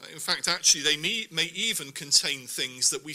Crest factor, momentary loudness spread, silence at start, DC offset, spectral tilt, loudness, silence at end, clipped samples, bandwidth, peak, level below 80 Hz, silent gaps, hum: 22 dB; 9 LU; 0 s; under 0.1%; 0 dB/octave; -24 LUFS; 0 s; under 0.1%; 16 kHz; -6 dBFS; -68 dBFS; none; none